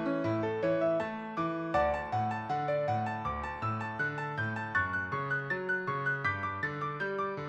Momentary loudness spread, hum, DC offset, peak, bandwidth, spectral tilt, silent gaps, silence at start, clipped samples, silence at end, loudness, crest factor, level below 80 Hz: 5 LU; none; under 0.1%; -18 dBFS; 9 kHz; -7.5 dB/octave; none; 0 s; under 0.1%; 0 s; -33 LUFS; 16 dB; -56 dBFS